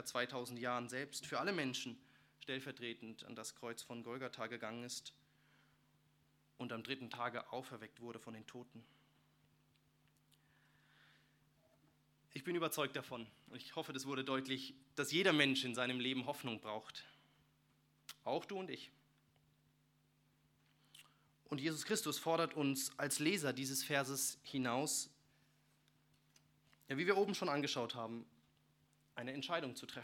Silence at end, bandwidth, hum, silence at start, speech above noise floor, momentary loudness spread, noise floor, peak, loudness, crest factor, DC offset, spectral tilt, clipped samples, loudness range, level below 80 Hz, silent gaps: 0 s; 18 kHz; none; 0 s; 34 dB; 16 LU; -76 dBFS; -16 dBFS; -41 LUFS; 28 dB; under 0.1%; -3 dB/octave; under 0.1%; 12 LU; -88 dBFS; none